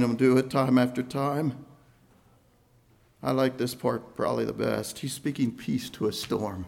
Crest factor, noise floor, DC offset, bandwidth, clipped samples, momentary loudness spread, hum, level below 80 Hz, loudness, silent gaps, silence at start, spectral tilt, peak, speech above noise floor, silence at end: 18 dB; -62 dBFS; under 0.1%; 16.5 kHz; under 0.1%; 9 LU; none; -62 dBFS; -28 LUFS; none; 0 s; -6 dB/octave; -10 dBFS; 35 dB; 0 s